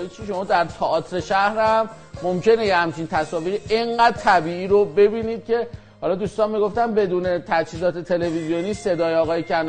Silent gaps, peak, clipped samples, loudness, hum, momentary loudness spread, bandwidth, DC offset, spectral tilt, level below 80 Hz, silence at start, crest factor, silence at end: none; -4 dBFS; under 0.1%; -21 LUFS; none; 8 LU; 9.4 kHz; under 0.1%; -5.5 dB/octave; -48 dBFS; 0 s; 16 dB; 0 s